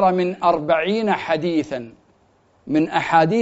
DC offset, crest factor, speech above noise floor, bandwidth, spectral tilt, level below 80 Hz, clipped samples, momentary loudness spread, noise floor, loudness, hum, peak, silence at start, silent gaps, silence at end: under 0.1%; 16 dB; 39 dB; 8 kHz; -4.5 dB/octave; -56 dBFS; under 0.1%; 10 LU; -58 dBFS; -20 LUFS; none; -2 dBFS; 0 s; none; 0 s